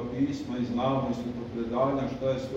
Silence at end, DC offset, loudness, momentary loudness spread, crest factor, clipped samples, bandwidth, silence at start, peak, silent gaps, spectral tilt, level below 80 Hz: 0 s; under 0.1%; -30 LUFS; 6 LU; 16 dB; under 0.1%; 8 kHz; 0 s; -14 dBFS; none; -7.5 dB/octave; -52 dBFS